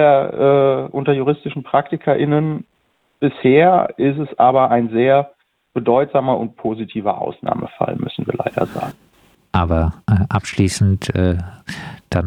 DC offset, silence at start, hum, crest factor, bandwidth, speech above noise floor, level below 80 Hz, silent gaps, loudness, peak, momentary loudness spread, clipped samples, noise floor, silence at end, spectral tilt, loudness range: under 0.1%; 0 s; none; 16 dB; 13 kHz; 38 dB; -38 dBFS; none; -17 LUFS; 0 dBFS; 10 LU; under 0.1%; -54 dBFS; 0 s; -7 dB/octave; 6 LU